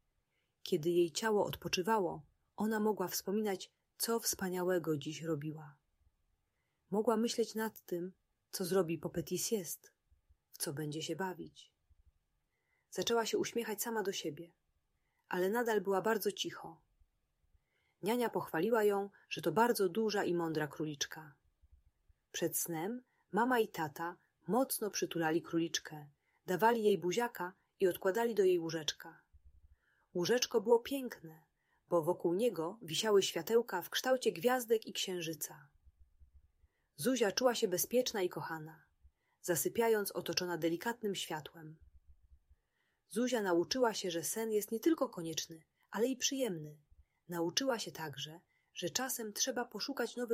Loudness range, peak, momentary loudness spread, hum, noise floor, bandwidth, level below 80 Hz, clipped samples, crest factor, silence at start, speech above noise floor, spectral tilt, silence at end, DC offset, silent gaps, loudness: 5 LU; -16 dBFS; 13 LU; none; -83 dBFS; 16 kHz; -74 dBFS; under 0.1%; 22 dB; 0.65 s; 47 dB; -3.5 dB/octave; 0 s; under 0.1%; none; -36 LUFS